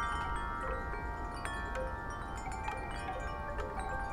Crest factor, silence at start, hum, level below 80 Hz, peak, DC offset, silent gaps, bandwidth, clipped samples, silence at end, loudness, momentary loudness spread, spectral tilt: 20 dB; 0 s; none; -44 dBFS; -18 dBFS; under 0.1%; none; 14.5 kHz; under 0.1%; 0 s; -39 LUFS; 3 LU; -5 dB/octave